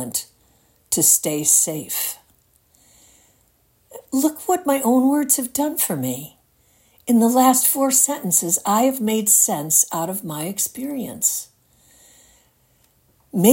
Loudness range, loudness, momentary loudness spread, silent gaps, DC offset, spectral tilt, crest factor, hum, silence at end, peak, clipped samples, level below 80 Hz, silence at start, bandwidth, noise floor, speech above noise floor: 8 LU; -18 LUFS; 12 LU; none; under 0.1%; -3.5 dB/octave; 20 dB; none; 0 s; 0 dBFS; under 0.1%; -66 dBFS; 0 s; 17 kHz; -61 dBFS; 42 dB